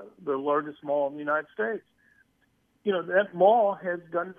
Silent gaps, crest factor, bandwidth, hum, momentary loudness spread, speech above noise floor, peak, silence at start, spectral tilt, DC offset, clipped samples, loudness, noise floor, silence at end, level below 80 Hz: none; 20 dB; 3.6 kHz; none; 11 LU; 43 dB; -8 dBFS; 0 s; -8 dB/octave; under 0.1%; under 0.1%; -27 LUFS; -70 dBFS; 0.05 s; -80 dBFS